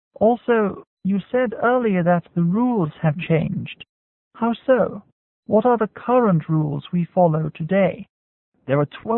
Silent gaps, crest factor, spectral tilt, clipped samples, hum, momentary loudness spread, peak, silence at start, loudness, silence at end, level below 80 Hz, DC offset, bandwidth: 0.87-0.97 s, 3.89-4.31 s, 5.12-5.43 s, 8.09-8.52 s; 16 dB; -13 dB/octave; under 0.1%; none; 8 LU; -4 dBFS; 0.2 s; -20 LUFS; 0 s; -58 dBFS; under 0.1%; 4 kHz